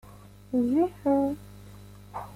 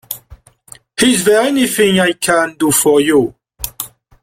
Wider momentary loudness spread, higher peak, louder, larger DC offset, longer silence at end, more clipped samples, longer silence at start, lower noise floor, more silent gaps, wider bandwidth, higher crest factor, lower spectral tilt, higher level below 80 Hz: first, 23 LU vs 16 LU; second, -14 dBFS vs 0 dBFS; second, -27 LUFS vs -13 LUFS; neither; second, 0 s vs 0.35 s; neither; about the same, 0.05 s vs 0.1 s; first, -49 dBFS vs -42 dBFS; neither; about the same, 15.5 kHz vs 16.5 kHz; about the same, 16 dB vs 14 dB; first, -8 dB/octave vs -3.5 dB/octave; second, -56 dBFS vs -46 dBFS